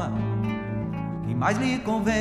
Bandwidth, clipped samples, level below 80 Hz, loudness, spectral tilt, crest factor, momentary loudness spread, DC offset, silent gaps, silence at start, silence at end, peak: 12 kHz; under 0.1%; -46 dBFS; -27 LUFS; -6.5 dB/octave; 16 dB; 7 LU; under 0.1%; none; 0 s; 0 s; -10 dBFS